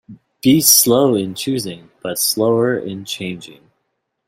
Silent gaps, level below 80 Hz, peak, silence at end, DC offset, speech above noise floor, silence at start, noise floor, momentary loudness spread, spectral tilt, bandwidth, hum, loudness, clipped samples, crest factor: none; -56 dBFS; 0 dBFS; 0.75 s; under 0.1%; 56 dB; 0.1 s; -72 dBFS; 18 LU; -3.5 dB/octave; 16.5 kHz; none; -15 LUFS; under 0.1%; 18 dB